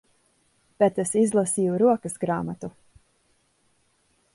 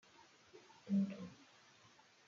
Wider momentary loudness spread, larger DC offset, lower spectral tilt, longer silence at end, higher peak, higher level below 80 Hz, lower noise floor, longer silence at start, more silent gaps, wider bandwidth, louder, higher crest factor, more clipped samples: second, 12 LU vs 26 LU; neither; second, -6 dB/octave vs -7.5 dB/octave; first, 1.65 s vs 0.85 s; first, -8 dBFS vs -28 dBFS; first, -64 dBFS vs -88 dBFS; about the same, -67 dBFS vs -67 dBFS; first, 0.8 s vs 0.55 s; neither; first, 12 kHz vs 7.2 kHz; first, -23 LUFS vs -42 LUFS; about the same, 18 dB vs 18 dB; neither